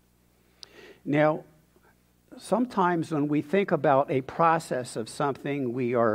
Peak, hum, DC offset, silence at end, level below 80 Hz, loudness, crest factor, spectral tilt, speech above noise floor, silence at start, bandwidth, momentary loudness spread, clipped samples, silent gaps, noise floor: -8 dBFS; 60 Hz at -60 dBFS; under 0.1%; 0 s; -68 dBFS; -26 LUFS; 18 dB; -6.5 dB/octave; 38 dB; 0.85 s; 15.5 kHz; 11 LU; under 0.1%; none; -64 dBFS